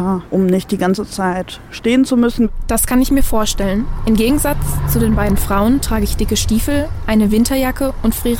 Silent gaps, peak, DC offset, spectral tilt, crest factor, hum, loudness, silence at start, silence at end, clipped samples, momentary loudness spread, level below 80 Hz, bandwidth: none; -4 dBFS; under 0.1%; -5 dB/octave; 12 dB; none; -16 LUFS; 0 s; 0 s; under 0.1%; 5 LU; -22 dBFS; 17 kHz